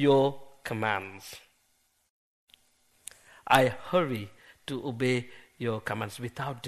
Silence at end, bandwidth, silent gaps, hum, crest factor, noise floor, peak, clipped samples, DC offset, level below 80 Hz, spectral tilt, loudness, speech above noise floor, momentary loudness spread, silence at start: 0 s; 13 kHz; 2.10-2.47 s; none; 28 dB; -71 dBFS; -2 dBFS; under 0.1%; under 0.1%; -66 dBFS; -5.5 dB/octave; -29 LUFS; 43 dB; 24 LU; 0 s